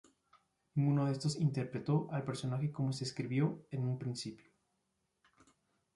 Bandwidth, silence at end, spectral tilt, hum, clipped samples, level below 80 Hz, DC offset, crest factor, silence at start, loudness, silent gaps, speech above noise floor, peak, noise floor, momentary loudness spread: 11.5 kHz; 1.6 s; -7 dB/octave; none; under 0.1%; -74 dBFS; under 0.1%; 16 dB; 0.75 s; -37 LUFS; none; 47 dB; -22 dBFS; -83 dBFS; 7 LU